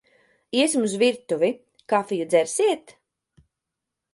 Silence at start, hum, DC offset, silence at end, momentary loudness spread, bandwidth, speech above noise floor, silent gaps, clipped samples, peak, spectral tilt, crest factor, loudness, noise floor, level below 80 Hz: 0.55 s; none; under 0.1%; 1.35 s; 6 LU; 11.5 kHz; 62 dB; none; under 0.1%; -6 dBFS; -3.5 dB/octave; 18 dB; -23 LUFS; -84 dBFS; -74 dBFS